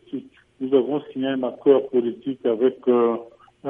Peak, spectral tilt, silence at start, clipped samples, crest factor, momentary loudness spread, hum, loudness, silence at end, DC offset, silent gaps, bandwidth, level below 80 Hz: -4 dBFS; -9 dB/octave; 0.1 s; under 0.1%; 18 dB; 12 LU; none; -22 LUFS; 0 s; under 0.1%; none; 3.7 kHz; -72 dBFS